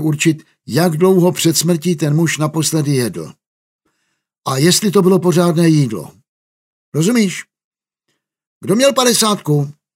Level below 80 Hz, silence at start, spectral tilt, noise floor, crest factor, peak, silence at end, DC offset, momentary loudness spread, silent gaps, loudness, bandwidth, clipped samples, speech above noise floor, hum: -62 dBFS; 0 s; -5 dB/octave; -71 dBFS; 14 dB; 0 dBFS; 0.25 s; under 0.1%; 12 LU; 3.47-3.79 s, 4.38-4.42 s, 6.29-6.92 s, 7.64-7.71 s, 8.47-8.61 s; -14 LUFS; 16.5 kHz; under 0.1%; 57 dB; none